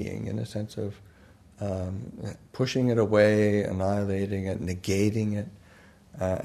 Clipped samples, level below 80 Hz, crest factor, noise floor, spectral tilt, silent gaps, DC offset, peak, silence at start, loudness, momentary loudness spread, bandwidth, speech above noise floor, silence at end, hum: under 0.1%; -56 dBFS; 20 dB; -54 dBFS; -6.5 dB/octave; none; under 0.1%; -8 dBFS; 0 s; -27 LUFS; 16 LU; 13.5 kHz; 27 dB; 0 s; none